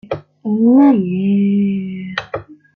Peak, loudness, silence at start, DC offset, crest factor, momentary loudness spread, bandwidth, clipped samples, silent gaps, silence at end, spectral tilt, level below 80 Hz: -2 dBFS; -15 LUFS; 0.1 s; under 0.1%; 14 dB; 17 LU; 6.2 kHz; under 0.1%; none; 0.2 s; -9 dB/octave; -56 dBFS